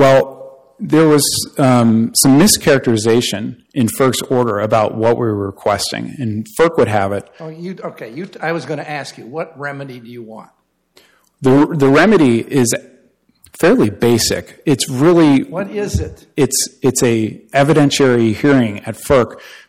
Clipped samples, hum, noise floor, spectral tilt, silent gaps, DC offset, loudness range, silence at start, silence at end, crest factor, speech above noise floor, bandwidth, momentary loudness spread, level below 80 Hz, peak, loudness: under 0.1%; none; -54 dBFS; -5 dB/octave; none; under 0.1%; 10 LU; 0 s; 0.15 s; 14 dB; 39 dB; 17 kHz; 16 LU; -42 dBFS; 0 dBFS; -14 LUFS